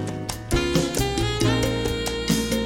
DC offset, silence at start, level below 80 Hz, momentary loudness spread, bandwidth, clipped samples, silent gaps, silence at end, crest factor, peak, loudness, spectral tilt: under 0.1%; 0 s; -34 dBFS; 4 LU; 17 kHz; under 0.1%; none; 0 s; 16 dB; -8 dBFS; -23 LUFS; -4.5 dB/octave